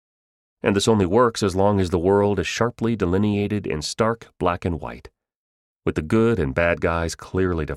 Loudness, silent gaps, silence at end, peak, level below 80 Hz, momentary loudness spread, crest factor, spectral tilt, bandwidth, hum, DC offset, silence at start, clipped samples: -21 LUFS; 5.36-5.80 s; 0 s; -4 dBFS; -42 dBFS; 8 LU; 18 dB; -6 dB/octave; 14 kHz; none; under 0.1%; 0.65 s; under 0.1%